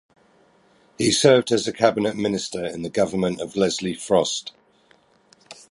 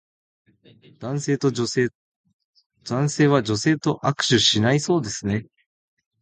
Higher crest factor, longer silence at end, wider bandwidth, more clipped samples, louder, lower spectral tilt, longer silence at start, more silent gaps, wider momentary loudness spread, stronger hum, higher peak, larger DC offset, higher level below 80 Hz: about the same, 22 dB vs 18 dB; second, 0.15 s vs 0.8 s; first, 11.5 kHz vs 9.4 kHz; neither; about the same, -21 LUFS vs -21 LUFS; about the same, -4 dB/octave vs -4.5 dB/octave; about the same, 1 s vs 1 s; second, none vs 1.95-2.24 s, 2.34-2.39 s, 2.45-2.53 s, 2.66-2.70 s; about the same, 11 LU vs 12 LU; neither; about the same, -2 dBFS vs -4 dBFS; neither; about the same, -56 dBFS vs -56 dBFS